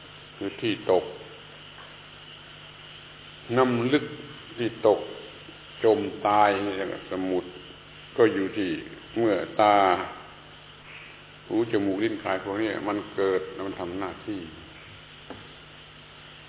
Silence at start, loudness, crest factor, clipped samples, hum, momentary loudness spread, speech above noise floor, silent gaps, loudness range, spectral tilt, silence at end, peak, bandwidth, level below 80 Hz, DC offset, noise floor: 0 s; -26 LUFS; 22 dB; under 0.1%; 50 Hz at -55 dBFS; 22 LU; 22 dB; none; 7 LU; -9.5 dB/octave; 0 s; -6 dBFS; 4 kHz; -60 dBFS; under 0.1%; -48 dBFS